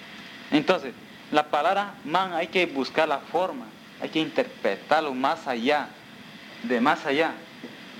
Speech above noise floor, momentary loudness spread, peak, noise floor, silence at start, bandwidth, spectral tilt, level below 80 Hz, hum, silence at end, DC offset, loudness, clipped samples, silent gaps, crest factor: 20 dB; 18 LU; -4 dBFS; -45 dBFS; 0 s; 17.5 kHz; -4.5 dB/octave; -74 dBFS; none; 0 s; under 0.1%; -25 LUFS; under 0.1%; none; 22 dB